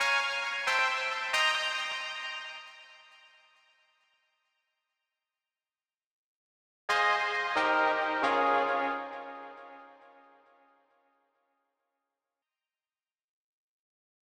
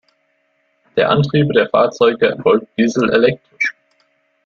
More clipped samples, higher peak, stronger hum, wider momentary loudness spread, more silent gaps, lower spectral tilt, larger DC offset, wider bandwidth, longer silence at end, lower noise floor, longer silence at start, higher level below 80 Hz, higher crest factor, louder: neither; second, -14 dBFS vs -2 dBFS; neither; first, 18 LU vs 7 LU; first, 6.06-6.88 s vs none; second, -0.5 dB/octave vs -6.5 dB/octave; neither; first, 19 kHz vs 7.4 kHz; first, 4.3 s vs 0.75 s; first, under -90 dBFS vs -63 dBFS; second, 0 s vs 0.95 s; second, -78 dBFS vs -54 dBFS; first, 22 dB vs 16 dB; second, -29 LUFS vs -15 LUFS